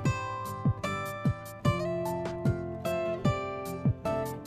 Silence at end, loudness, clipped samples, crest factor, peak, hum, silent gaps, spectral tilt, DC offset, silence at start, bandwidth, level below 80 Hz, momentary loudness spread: 0 s; -32 LUFS; under 0.1%; 18 dB; -14 dBFS; none; none; -7 dB/octave; under 0.1%; 0 s; 14 kHz; -50 dBFS; 4 LU